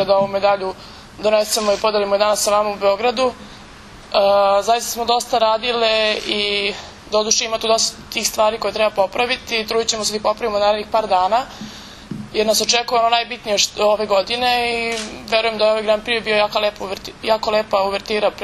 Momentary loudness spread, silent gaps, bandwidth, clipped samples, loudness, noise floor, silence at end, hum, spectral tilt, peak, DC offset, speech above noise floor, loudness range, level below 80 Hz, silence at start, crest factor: 7 LU; none; 13.5 kHz; under 0.1%; -18 LUFS; -39 dBFS; 0 s; none; -1.5 dB/octave; 0 dBFS; under 0.1%; 21 dB; 1 LU; -48 dBFS; 0 s; 18 dB